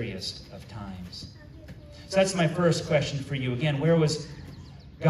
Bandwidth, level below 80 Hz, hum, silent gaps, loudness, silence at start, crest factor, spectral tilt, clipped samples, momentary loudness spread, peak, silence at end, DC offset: 12 kHz; -52 dBFS; none; none; -26 LUFS; 0 s; 18 dB; -5.5 dB/octave; under 0.1%; 22 LU; -10 dBFS; 0 s; under 0.1%